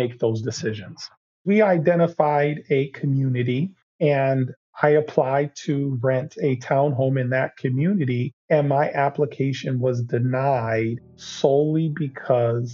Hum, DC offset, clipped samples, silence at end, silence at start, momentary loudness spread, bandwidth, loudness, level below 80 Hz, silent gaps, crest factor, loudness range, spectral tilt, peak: none; under 0.1%; under 0.1%; 0 s; 0 s; 9 LU; 7.4 kHz; -22 LUFS; -68 dBFS; 1.17-1.45 s, 3.82-3.99 s, 4.57-4.73 s, 8.33-8.48 s; 20 dB; 1 LU; -7 dB/octave; -2 dBFS